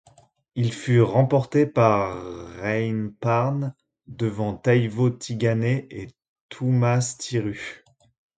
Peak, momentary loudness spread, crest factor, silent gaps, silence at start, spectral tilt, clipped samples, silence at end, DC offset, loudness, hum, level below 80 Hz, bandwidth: -4 dBFS; 16 LU; 20 dB; 6.28-6.49 s; 0.55 s; -7 dB/octave; under 0.1%; 0.65 s; under 0.1%; -23 LUFS; none; -56 dBFS; 9.2 kHz